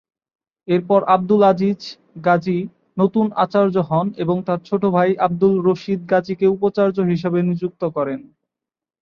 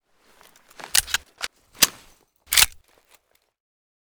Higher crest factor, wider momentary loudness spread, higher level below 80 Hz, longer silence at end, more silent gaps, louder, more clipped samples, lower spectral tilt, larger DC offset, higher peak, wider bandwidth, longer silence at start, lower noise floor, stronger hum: second, 16 dB vs 28 dB; second, 8 LU vs 17 LU; second, -60 dBFS vs -50 dBFS; second, 0.8 s vs 1.35 s; neither; about the same, -18 LUFS vs -20 LUFS; neither; first, -9 dB/octave vs 1.5 dB/octave; neither; about the same, -2 dBFS vs 0 dBFS; second, 6.8 kHz vs over 20 kHz; second, 0.7 s vs 0.95 s; first, -87 dBFS vs -61 dBFS; neither